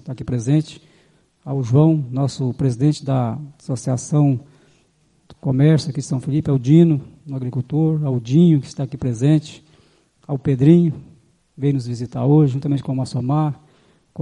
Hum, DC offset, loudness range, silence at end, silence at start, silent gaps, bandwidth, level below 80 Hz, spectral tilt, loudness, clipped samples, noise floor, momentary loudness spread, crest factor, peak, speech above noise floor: none; under 0.1%; 3 LU; 0 s; 0.05 s; none; 10.5 kHz; -54 dBFS; -8 dB/octave; -19 LUFS; under 0.1%; -60 dBFS; 14 LU; 18 dB; -2 dBFS; 42 dB